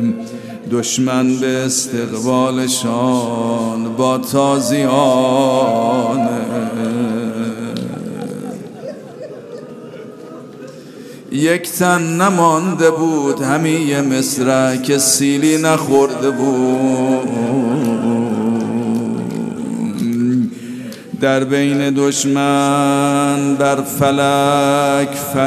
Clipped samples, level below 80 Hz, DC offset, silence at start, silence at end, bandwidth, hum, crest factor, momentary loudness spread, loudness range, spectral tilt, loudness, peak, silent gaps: under 0.1%; -62 dBFS; under 0.1%; 0 s; 0 s; 14 kHz; none; 16 dB; 16 LU; 9 LU; -4.5 dB/octave; -15 LUFS; 0 dBFS; none